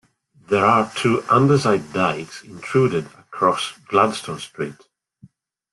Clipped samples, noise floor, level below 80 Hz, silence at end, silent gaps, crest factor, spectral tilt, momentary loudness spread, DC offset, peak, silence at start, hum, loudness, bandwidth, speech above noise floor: under 0.1%; -52 dBFS; -58 dBFS; 1 s; none; 18 dB; -6 dB/octave; 14 LU; under 0.1%; -2 dBFS; 0.5 s; none; -20 LUFS; 12 kHz; 32 dB